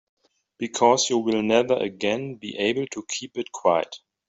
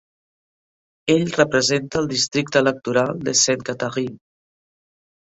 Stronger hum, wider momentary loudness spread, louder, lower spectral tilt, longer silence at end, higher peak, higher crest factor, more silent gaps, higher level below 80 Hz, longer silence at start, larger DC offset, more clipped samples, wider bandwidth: neither; first, 12 LU vs 8 LU; second, -23 LUFS vs -20 LUFS; about the same, -3.5 dB/octave vs -3 dB/octave; second, 0.3 s vs 1.1 s; about the same, -4 dBFS vs -2 dBFS; about the same, 20 dB vs 20 dB; neither; second, -66 dBFS vs -56 dBFS; second, 0.6 s vs 1.05 s; neither; neither; about the same, 8.2 kHz vs 8.4 kHz